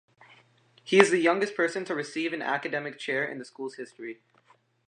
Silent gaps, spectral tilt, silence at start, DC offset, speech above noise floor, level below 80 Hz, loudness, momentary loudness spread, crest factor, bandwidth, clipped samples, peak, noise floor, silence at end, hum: none; -4 dB/octave; 0.85 s; under 0.1%; 37 dB; -82 dBFS; -27 LUFS; 19 LU; 28 dB; 10 kHz; under 0.1%; -2 dBFS; -64 dBFS; 0.75 s; none